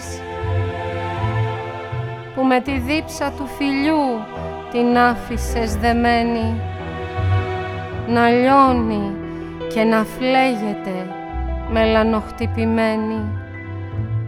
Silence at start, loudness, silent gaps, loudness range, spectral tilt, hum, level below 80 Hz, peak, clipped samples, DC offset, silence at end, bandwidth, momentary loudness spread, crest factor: 0 s; -20 LUFS; none; 4 LU; -6.5 dB/octave; none; -34 dBFS; -2 dBFS; under 0.1%; under 0.1%; 0 s; 15.5 kHz; 12 LU; 18 dB